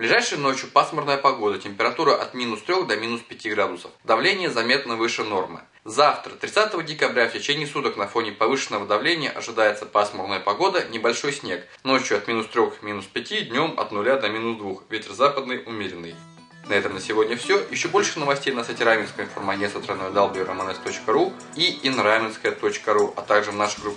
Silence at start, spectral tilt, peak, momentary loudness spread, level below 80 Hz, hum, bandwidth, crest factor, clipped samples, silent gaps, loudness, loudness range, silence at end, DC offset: 0 s; -3 dB/octave; -4 dBFS; 9 LU; -72 dBFS; none; 10.5 kHz; 20 dB; under 0.1%; none; -23 LUFS; 2 LU; 0 s; under 0.1%